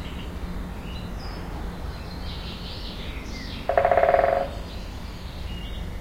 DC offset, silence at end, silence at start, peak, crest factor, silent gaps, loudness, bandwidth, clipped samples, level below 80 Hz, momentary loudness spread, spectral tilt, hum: under 0.1%; 0 s; 0 s; -2 dBFS; 24 dB; none; -28 LUFS; 16 kHz; under 0.1%; -36 dBFS; 16 LU; -6 dB/octave; none